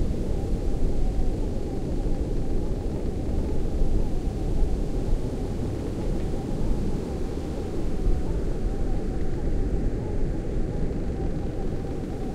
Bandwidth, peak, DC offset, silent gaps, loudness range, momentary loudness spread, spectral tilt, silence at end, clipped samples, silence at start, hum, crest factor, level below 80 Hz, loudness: 9.6 kHz; -10 dBFS; under 0.1%; none; 1 LU; 2 LU; -8 dB/octave; 0 s; under 0.1%; 0 s; none; 14 dB; -26 dBFS; -30 LUFS